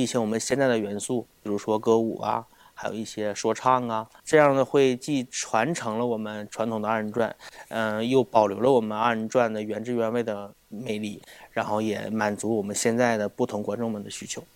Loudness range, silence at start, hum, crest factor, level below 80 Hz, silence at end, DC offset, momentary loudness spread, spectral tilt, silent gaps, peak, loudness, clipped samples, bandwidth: 4 LU; 0 s; none; 22 dB; -66 dBFS; 0.1 s; under 0.1%; 12 LU; -4.5 dB/octave; none; -4 dBFS; -26 LUFS; under 0.1%; 17 kHz